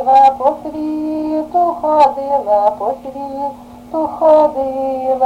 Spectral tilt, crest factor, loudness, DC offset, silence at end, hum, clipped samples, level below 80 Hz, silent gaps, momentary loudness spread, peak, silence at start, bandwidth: -6.5 dB/octave; 14 dB; -15 LUFS; under 0.1%; 0 s; none; under 0.1%; -50 dBFS; none; 14 LU; 0 dBFS; 0 s; 10 kHz